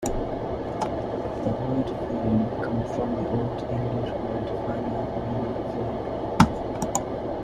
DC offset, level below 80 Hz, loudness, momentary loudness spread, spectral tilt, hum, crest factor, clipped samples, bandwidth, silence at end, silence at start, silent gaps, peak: under 0.1%; -42 dBFS; -27 LUFS; 7 LU; -6.5 dB/octave; none; 24 dB; under 0.1%; 14 kHz; 0 s; 0 s; none; -2 dBFS